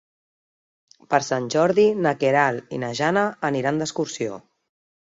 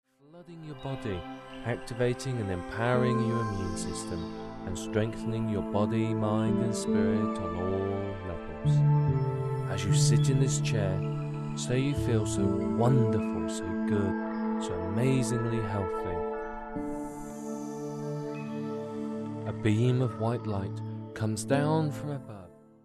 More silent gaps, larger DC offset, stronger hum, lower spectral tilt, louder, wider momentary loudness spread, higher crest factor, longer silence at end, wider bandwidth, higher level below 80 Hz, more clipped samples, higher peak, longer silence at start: neither; neither; neither; second, -5 dB/octave vs -6.5 dB/octave; first, -22 LUFS vs -30 LUFS; about the same, 11 LU vs 12 LU; about the same, 20 dB vs 18 dB; first, 0.65 s vs 0.3 s; second, 7.8 kHz vs 12.5 kHz; second, -66 dBFS vs -50 dBFS; neither; first, -4 dBFS vs -12 dBFS; first, 1.1 s vs 0.35 s